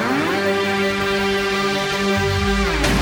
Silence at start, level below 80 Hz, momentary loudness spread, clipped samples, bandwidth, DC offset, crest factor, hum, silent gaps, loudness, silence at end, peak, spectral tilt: 0 s; -30 dBFS; 1 LU; under 0.1%; 18.5 kHz; under 0.1%; 12 dB; none; none; -19 LUFS; 0 s; -6 dBFS; -4.5 dB/octave